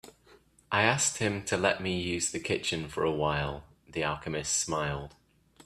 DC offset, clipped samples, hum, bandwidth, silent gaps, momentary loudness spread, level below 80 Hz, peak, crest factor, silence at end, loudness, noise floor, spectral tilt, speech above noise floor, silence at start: under 0.1%; under 0.1%; none; 15 kHz; none; 10 LU; -54 dBFS; -6 dBFS; 24 dB; 0.05 s; -30 LUFS; -61 dBFS; -3 dB/octave; 30 dB; 0.05 s